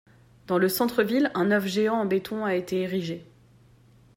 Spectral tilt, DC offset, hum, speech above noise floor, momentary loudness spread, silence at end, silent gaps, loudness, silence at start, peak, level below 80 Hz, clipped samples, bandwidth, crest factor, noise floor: -5.5 dB/octave; under 0.1%; none; 31 dB; 6 LU; 0.95 s; none; -25 LUFS; 0.5 s; -8 dBFS; -64 dBFS; under 0.1%; 16 kHz; 18 dB; -56 dBFS